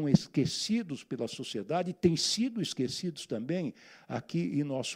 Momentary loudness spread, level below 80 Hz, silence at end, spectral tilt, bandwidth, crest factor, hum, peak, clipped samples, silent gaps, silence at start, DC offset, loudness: 10 LU; -66 dBFS; 0 s; -5 dB/octave; 15.5 kHz; 22 dB; none; -10 dBFS; under 0.1%; none; 0 s; under 0.1%; -32 LUFS